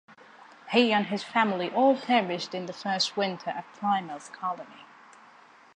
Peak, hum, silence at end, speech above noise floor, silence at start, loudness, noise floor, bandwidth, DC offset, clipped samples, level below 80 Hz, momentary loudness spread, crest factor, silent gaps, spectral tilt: -8 dBFS; none; 0.9 s; 27 dB; 0.1 s; -27 LUFS; -55 dBFS; 10 kHz; under 0.1%; under 0.1%; -82 dBFS; 12 LU; 20 dB; none; -4.5 dB/octave